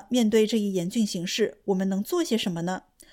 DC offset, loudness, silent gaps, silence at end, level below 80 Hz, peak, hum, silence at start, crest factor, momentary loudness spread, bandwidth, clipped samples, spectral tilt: under 0.1%; -26 LUFS; none; 0.35 s; -64 dBFS; -10 dBFS; none; 0 s; 16 dB; 7 LU; 16.5 kHz; under 0.1%; -5 dB/octave